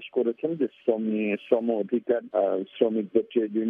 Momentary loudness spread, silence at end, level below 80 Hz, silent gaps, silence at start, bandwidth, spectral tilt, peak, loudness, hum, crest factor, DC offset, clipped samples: 3 LU; 0 s; -80 dBFS; none; 0 s; 3.7 kHz; -9.5 dB/octave; -8 dBFS; -26 LUFS; none; 18 dB; under 0.1%; under 0.1%